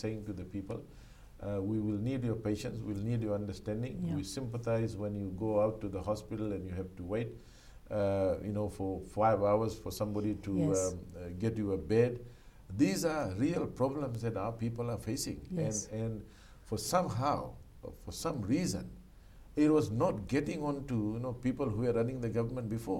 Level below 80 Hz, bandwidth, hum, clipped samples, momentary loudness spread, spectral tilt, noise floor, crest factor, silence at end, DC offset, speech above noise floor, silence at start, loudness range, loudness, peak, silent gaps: -54 dBFS; 16.5 kHz; none; under 0.1%; 11 LU; -6.5 dB/octave; -55 dBFS; 18 dB; 0 s; under 0.1%; 21 dB; 0 s; 4 LU; -35 LUFS; -16 dBFS; none